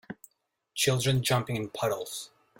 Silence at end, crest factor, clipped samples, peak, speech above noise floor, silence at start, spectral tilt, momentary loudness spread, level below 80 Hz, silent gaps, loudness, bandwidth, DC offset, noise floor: 0.35 s; 18 dB; under 0.1%; -14 dBFS; 47 dB; 0.1 s; -4 dB/octave; 15 LU; -62 dBFS; none; -28 LUFS; 16.5 kHz; under 0.1%; -75 dBFS